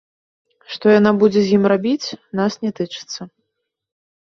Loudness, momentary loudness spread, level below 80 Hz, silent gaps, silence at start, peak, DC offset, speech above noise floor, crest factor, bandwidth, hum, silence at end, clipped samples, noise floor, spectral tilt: -17 LUFS; 16 LU; -60 dBFS; none; 0.7 s; -2 dBFS; under 0.1%; 60 dB; 18 dB; 7.2 kHz; none; 1.05 s; under 0.1%; -77 dBFS; -6 dB/octave